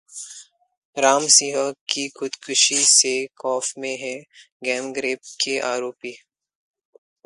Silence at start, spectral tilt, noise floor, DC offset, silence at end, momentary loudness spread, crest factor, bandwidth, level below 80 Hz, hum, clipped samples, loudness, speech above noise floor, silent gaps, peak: 0.1 s; 0 dB/octave; -45 dBFS; under 0.1%; 1.1 s; 21 LU; 22 dB; 11.5 kHz; -76 dBFS; none; under 0.1%; -19 LUFS; 23 dB; 0.78-0.93 s, 1.81-1.86 s, 4.52-4.60 s; -2 dBFS